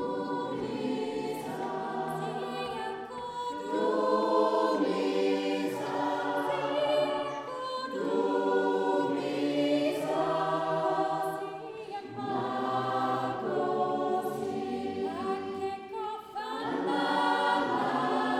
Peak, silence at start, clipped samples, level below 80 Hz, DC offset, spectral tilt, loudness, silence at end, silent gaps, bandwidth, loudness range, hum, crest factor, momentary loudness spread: -14 dBFS; 0 s; under 0.1%; -72 dBFS; under 0.1%; -5.5 dB/octave; -31 LUFS; 0 s; none; 15 kHz; 4 LU; none; 16 dB; 9 LU